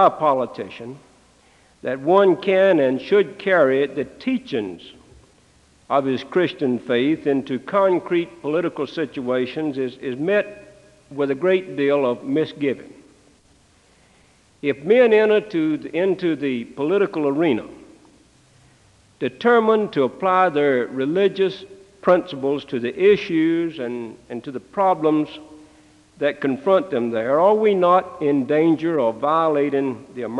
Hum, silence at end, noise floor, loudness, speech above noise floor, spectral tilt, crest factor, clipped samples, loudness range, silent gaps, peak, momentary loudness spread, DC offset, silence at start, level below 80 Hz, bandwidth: none; 0 s; -56 dBFS; -20 LUFS; 36 dB; -7 dB/octave; 18 dB; under 0.1%; 5 LU; none; -2 dBFS; 12 LU; under 0.1%; 0 s; -64 dBFS; 9.8 kHz